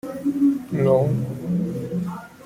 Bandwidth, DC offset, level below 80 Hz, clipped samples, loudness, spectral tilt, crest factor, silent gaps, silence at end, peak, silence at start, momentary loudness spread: 16 kHz; under 0.1%; -56 dBFS; under 0.1%; -23 LUFS; -9.5 dB/octave; 16 dB; none; 0 s; -6 dBFS; 0.05 s; 9 LU